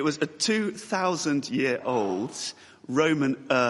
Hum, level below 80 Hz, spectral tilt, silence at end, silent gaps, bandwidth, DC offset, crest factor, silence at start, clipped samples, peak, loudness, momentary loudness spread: none; -70 dBFS; -4 dB/octave; 0 s; none; 11.5 kHz; under 0.1%; 18 dB; 0 s; under 0.1%; -8 dBFS; -27 LUFS; 8 LU